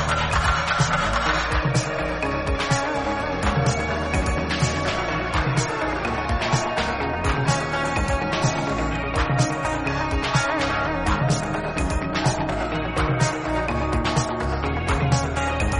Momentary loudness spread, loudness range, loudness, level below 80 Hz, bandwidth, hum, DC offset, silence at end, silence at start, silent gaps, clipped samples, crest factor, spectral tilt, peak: 4 LU; 1 LU; -23 LUFS; -32 dBFS; 11.5 kHz; none; under 0.1%; 0 s; 0 s; none; under 0.1%; 16 dB; -5 dB/octave; -6 dBFS